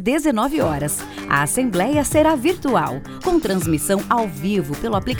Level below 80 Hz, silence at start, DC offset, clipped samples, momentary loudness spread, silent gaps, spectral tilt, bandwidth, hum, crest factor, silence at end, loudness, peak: -38 dBFS; 0 s; under 0.1%; under 0.1%; 6 LU; none; -5 dB/octave; over 20 kHz; none; 16 dB; 0 s; -19 LUFS; -2 dBFS